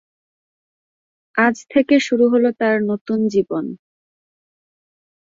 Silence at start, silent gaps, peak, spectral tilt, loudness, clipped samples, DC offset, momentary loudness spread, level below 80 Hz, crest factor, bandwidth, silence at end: 1.35 s; 3.01-3.05 s; -4 dBFS; -5.5 dB/octave; -18 LUFS; under 0.1%; under 0.1%; 10 LU; -64 dBFS; 16 dB; 7.6 kHz; 1.5 s